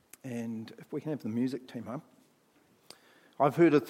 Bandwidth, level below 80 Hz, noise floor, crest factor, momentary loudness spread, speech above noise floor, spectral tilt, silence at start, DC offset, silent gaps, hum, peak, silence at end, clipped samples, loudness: 15.5 kHz; -84 dBFS; -67 dBFS; 20 dB; 16 LU; 36 dB; -7.5 dB/octave; 0.25 s; under 0.1%; none; none; -12 dBFS; 0 s; under 0.1%; -33 LUFS